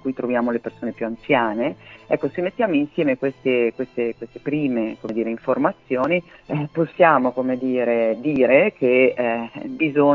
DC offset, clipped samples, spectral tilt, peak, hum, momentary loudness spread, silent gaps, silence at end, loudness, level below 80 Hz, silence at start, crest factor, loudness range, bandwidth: under 0.1%; under 0.1%; -8.5 dB/octave; -2 dBFS; none; 11 LU; none; 0 s; -21 LUFS; -60 dBFS; 0.05 s; 18 dB; 4 LU; 6.4 kHz